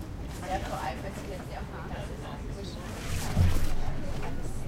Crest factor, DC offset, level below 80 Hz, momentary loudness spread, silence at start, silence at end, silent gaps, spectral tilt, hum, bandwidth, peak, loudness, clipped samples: 18 dB; under 0.1%; -34 dBFS; 11 LU; 0 s; 0 s; none; -5.5 dB/octave; none; 15.5 kHz; -12 dBFS; -35 LUFS; under 0.1%